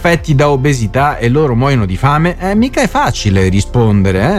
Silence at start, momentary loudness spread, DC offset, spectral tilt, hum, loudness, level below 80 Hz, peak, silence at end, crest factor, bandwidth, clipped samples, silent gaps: 0 s; 2 LU; under 0.1%; -6.5 dB/octave; none; -12 LUFS; -26 dBFS; 0 dBFS; 0 s; 10 dB; 14.5 kHz; under 0.1%; none